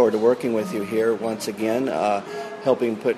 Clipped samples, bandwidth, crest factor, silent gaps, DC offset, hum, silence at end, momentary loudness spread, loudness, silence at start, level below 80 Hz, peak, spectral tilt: under 0.1%; 13.5 kHz; 16 dB; none; under 0.1%; none; 0 s; 6 LU; -23 LUFS; 0 s; -66 dBFS; -6 dBFS; -5.5 dB/octave